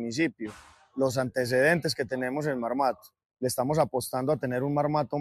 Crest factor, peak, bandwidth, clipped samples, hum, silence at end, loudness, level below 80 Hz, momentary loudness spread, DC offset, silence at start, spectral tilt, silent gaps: 18 dB; -10 dBFS; 15 kHz; under 0.1%; none; 0 s; -28 LUFS; -62 dBFS; 8 LU; under 0.1%; 0 s; -5 dB/octave; none